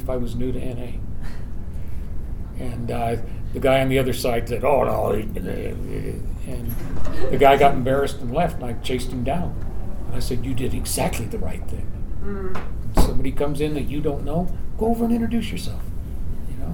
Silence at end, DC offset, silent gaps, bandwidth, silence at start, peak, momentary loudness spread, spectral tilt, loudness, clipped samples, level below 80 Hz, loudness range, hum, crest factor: 0 s; under 0.1%; none; 18.5 kHz; 0 s; 0 dBFS; 14 LU; -6 dB/octave; -24 LUFS; under 0.1%; -28 dBFS; 6 LU; none; 20 dB